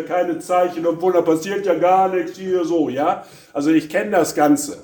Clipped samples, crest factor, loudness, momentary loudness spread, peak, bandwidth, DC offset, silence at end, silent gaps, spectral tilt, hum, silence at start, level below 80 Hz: under 0.1%; 16 dB; -18 LUFS; 6 LU; -2 dBFS; 19 kHz; under 0.1%; 0 s; none; -5 dB/octave; none; 0 s; -62 dBFS